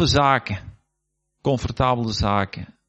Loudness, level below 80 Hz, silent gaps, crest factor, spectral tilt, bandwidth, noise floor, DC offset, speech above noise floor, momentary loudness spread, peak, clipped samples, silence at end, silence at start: -22 LUFS; -40 dBFS; none; 20 dB; -5.5 dB/octave; 8.4 kHz; -76 dBFS; under 0.1%; 55 dB; 12 LU; -4 dBFS; under 0.1%; 0.25 s; 0 s